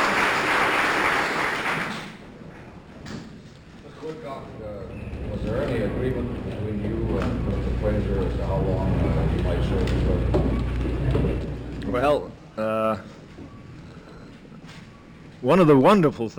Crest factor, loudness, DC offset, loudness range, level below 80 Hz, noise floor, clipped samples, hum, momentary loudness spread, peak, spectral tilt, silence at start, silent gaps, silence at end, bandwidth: 18 dB; -23 LUFS; under 0.1%; 9 LU; -32 dBFS; -45 dBFS; under 0.1%; none; 23 LU; -8 dBFS; -6.5 dB/octave; 0 s; none; 0 s; 16.5 kHz